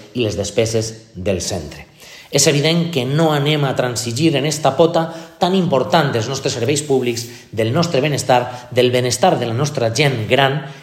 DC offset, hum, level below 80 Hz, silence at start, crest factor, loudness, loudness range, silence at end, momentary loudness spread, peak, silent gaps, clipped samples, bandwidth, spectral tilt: under 0.1%; none; -52 dBFS; 0 s; 16 dB; -17 LUFS; 2 LU; 0 s; 7 LU; 0 dBFS; none; under 0.1%; 16 kHz; -4.5 dB/octave